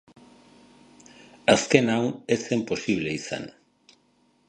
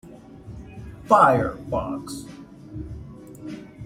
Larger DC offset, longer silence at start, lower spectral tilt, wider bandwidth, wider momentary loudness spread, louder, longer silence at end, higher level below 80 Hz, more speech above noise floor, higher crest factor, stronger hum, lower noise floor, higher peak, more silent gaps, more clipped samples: neither; first, 1.45 s vs 0.05 s; second, -4.5 dB/octave vs -6.5 dB/octave; second, 11 kHz vs 16 kHz; second, 14 LU vs 26 LU; second, -24 LUFS vs -20 LUFS; first, 1 s vs 0 s; second, -60 dBFS vs -46 dBFS; first, 41 dB vs 22 dB; about the same, 26 dB vs 22 dB; neither; first, -65 dBFS vs -42 dBFS; about the same, -2 dBFS vs -2 dBFS; neither; neither